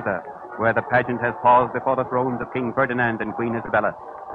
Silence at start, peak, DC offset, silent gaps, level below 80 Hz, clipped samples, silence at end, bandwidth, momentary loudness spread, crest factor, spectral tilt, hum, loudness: 0 s; -6 dBFS; under 0.1%; none; -54 dBFS; under 0.1%; 0 s; 4.9 kHz; 10 LU; 16 dB; -9 dB/octave; none; -22 LUFS